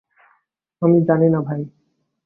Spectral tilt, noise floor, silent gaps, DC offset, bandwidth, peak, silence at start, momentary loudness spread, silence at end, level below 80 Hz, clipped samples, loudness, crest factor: -14 dB/octave; -65 dBFS; none; under 0.1%; 2.5 kHz; -4 dBFS; 0.8 s; 13 LU; 0.55 s; -62 dBFS; under 0.1%; -18 LUFS; 16 dB